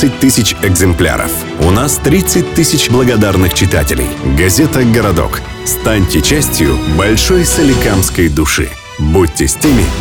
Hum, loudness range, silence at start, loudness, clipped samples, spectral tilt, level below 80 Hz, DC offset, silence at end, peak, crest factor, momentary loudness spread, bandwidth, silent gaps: none; 1 LU; 0 s; -10 LUFS; under 0.1%; -4.5 dB/octave; -20 dBFS; under 0.1%; 0 s; 0 dBFS; 10 dB; 5 LU; 19 kHz; none